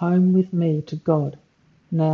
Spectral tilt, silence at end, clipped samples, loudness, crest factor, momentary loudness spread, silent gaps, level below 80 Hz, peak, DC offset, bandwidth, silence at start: -10.5 dB/octave; 0 s; under 0.1%; -21 LUFS; 14 dB; 9 LU; none; -64 dBFS; -6 dBFS; under 0.1%; 5.8 kHz; 0 s